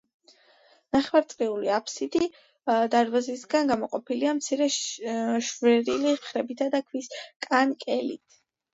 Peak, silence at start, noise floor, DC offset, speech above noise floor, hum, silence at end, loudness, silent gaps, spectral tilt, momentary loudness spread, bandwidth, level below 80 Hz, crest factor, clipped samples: -8 dBFS; 0.95 s; -60 dBFS; under 0.1%; 34 dB; none; 0.6 s; -26 LUFS; 7.36-7.40 s; -3 dB/octave; 9 LU; 8 kHz; -68 dBFS; 20 dB; under 0.1%